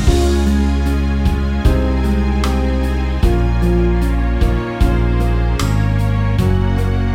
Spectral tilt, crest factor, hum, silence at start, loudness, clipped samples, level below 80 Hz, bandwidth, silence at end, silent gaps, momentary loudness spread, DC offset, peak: -7 dB/octave; 14 dB; none; 0 s; -16 LUFS; under 0.1%; -16 dBFS; 15 kHz; 0 s; none; 2 LU; under 0.1%; 0 dBFS